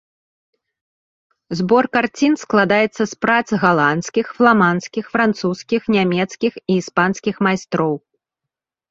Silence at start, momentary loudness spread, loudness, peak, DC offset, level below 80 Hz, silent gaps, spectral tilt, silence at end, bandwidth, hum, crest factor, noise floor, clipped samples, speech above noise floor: 1.5 s; 8 LU; -17 LUFS; -2 dBFS; under 0.1%; -58 dBFS; none; -5.5 dB/octave; 0.95 s; 7.8 kHz; none; 16 dB; -84 dBFS; under 0.1%; 67 dB